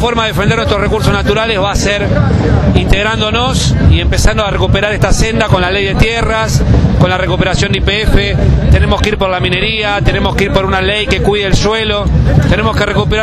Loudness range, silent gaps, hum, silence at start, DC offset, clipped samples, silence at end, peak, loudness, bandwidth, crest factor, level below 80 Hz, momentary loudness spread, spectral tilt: 0 LU; none; none; 0 s; under 0.1%; 0.3%; 0 s; 0 dBFS; -11 LUFS; 13.5 kHz; 10 dB; -16 dBFS; 2 LU; -5.5 dB/octave